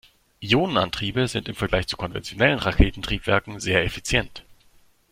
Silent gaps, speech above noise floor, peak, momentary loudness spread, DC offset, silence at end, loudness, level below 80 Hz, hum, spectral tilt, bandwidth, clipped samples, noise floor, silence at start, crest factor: none; 34 dB; -2 dBFS; 8 LU; under 0.1%; 0.7 s; -23 LUFS; -32 dBFS; none; -5 dB/octave; 16 kHz; under 0.1%; -57 dBFS; 0.4 s; 22 dB